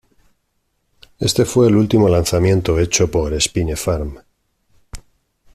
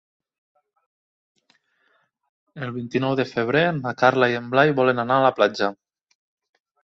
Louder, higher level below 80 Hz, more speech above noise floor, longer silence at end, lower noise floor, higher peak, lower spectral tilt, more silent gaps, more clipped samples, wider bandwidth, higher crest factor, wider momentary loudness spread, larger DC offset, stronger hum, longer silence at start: first, -16 LUFS vs -21 LUFS; first, -34 dBFS vs -64 dBFS; first, 52 dB vs 46 dB; second, 0.55 s vs 1.1 s; about the same, -68 dBFS vs -66 dBFS; about the same, 0 dBFS vs -2 dBFS; second, -5 dB/octave vs -6.5 dB/octave; neither; neither; first, 15 kHz vs 7.6 kHz; about the same, 18 dB vs 22 dB; about the same, 8 LU vs 9 LU; neither; neither; second, 1.2 s vs 2.55 s